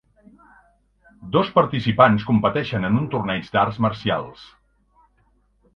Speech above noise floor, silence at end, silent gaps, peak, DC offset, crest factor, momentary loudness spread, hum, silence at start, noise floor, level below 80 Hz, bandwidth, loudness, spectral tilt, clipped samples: 42 dB; 1.3 s; none; 0 dBFS; under 0.1%; 22 dB; 9 LU; 50 Hz at -45 dBFS; 1.2 s; -62 dBFS; -50 dBFS; 6.6 kHz; -20 LUFS; -8.5 dB/octave; under 0.1%